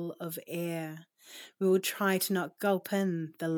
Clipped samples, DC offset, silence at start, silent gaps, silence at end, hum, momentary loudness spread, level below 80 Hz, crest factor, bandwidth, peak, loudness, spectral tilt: under 0.1%; under 0.1%; 0 s; none; 0 s; none; 20 LU; under -90 dBFS; 16 dB; over 20 kHz; -16 dBFS; -31 LUFS; -5 dB/octave